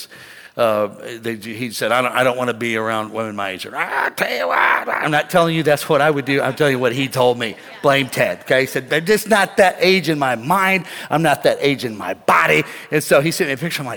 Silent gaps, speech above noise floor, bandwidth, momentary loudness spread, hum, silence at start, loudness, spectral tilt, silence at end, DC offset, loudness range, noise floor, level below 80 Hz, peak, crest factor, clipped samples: none; 23 dB; 19 kHz; 10 LU; none; 0 s; -17 LUFS; -4.5 dB/octave; 0 s; under 0.1%; 4 LU; -40 dBFS; -60 dBFS; -2 dBFS; 16 dB; under 0.1%